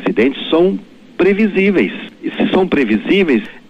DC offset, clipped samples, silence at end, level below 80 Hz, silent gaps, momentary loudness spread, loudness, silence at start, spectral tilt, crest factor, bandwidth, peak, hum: under 0.1%; under 0.1%; 0.1 s; -46 dBFS; none; 11 LU; -14 LUFS; 0 s; -7.5 dB/octave; 12 dB; 8.4 kHz; -4 dBFS; none